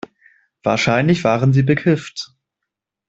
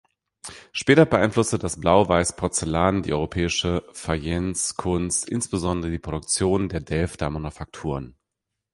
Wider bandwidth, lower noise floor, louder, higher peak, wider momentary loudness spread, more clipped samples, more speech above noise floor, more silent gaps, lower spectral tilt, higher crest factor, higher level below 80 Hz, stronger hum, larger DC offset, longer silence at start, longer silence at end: second, 8 kHz vs 11.5 kHz; about the same, -81 dBFS vs -83 dBFS; first, -17 LUFS vs -23 LUFS; about the same, -2 dBFS vs -2 dBFS; about the same, 15 LU vs 14 LU; neither; first, 66 dB vs 60 dB; neither; first, -6.5 dB/octave vs -4.5 dB/octave; about the same, 16 dB vs 20 dB; second, -52 dBFS vs -40 dBFS; neither; neither; first, 0.65 s vs 0.45 s; first, 0.85 s vs 0.65 s